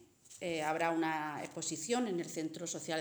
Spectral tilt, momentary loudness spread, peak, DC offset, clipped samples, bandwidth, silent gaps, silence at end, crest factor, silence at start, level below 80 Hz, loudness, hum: -3.5 dB/octave; 8 LU; -18 dBFS; under 0.1%; under 0.1%; over 20 kHz; none; 0 s; 18 dB; 0 s; -82 dBFS; -37 LUFS; none